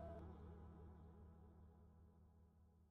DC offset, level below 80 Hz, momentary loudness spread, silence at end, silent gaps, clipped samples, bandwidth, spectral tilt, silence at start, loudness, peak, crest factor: under 0.1%; -66 dBFS; 11 LU; 0 s; none; under 0.1%; 5.4 kHz; -9 dB/octave; 0 s; -62 LUFS; -44 dBFS; 16 dB